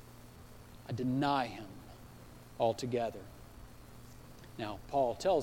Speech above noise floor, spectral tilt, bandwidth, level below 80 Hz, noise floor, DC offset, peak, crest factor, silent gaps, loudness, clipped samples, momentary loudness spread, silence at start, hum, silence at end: 20 dB; -6 dB/octave; 16.5 kHz; -58 dBFS; -54 dBFS; under 0.1%; -18 dBFS; 18 dB; none; -35 LUFS; under 0.1%; 23 LU; 0 s; none; 0 s